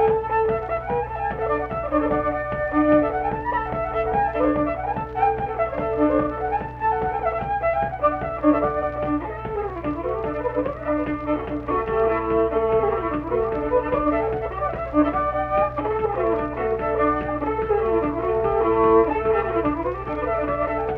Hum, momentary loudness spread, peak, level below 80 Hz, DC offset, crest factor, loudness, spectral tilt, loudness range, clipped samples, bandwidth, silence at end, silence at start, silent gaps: none; 6 LU; -6 dBFS; -38 dBFS; under 0.1%; 18 dB; -23 LUFS; -9.5 dB/octave; 3 LU; under 0.1%; 4.8 kHz; 0 s; 0 s; none